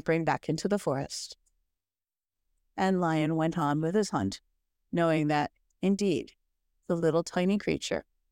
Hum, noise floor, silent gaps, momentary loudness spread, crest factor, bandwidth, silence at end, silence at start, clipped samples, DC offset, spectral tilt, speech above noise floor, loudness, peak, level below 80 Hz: none; under -90 dBFS; none; 9 LU; 16 dB; 16 kHz; 0.3 s; 0.05 s; under 0.1%; under 0.1%; -6 dB/octave; over 62 dB; -29 LUFS; -14 dBFS; -62 dBFS